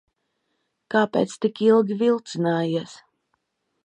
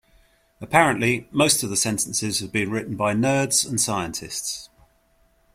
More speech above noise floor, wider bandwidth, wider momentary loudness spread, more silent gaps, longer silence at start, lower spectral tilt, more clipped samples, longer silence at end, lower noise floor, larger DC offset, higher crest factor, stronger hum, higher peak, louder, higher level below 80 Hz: first, 53 dB vs 39 dB; second, 10 kHz vs 16.5 kHz; about the same, 8 LU vs 10 LU; neither; first, 0.9 s vs 0.6 s; first, -6 dB/octave vs -3 dB/octave; neither; about the same, 0.9 s vs 0.9 s; first, -75 dBFS vs -62 dBFS; neither; about the same, 18 dB vs 22 dB; neither; second, -6 dBFS vs -2 dBFS; about the same, -22 LUFS vs -21 LUFS; second, -72 dBFS vs -56 dBFS